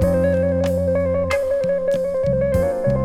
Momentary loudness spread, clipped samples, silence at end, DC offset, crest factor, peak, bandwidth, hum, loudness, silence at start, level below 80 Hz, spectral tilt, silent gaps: 2 LU; under 0.1%; 0 s; under 0.1%; 12 dB; -6 dBFS; 14 kHz; none; -19 LUFS; 0 s; -34 dBFS; -7.5 dB/octave; none